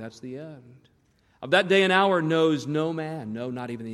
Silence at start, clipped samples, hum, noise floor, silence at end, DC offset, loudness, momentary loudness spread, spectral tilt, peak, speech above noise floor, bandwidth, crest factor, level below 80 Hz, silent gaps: 0 s; under 0.1%; none; -64 dBFS; 0 s; under 0.1%; -24 LUFS; 19 LU; -5.5 dB/octave; -6 dBFS; 39 dB; 12.5 kHz; 18 dB; -72 dBFS; none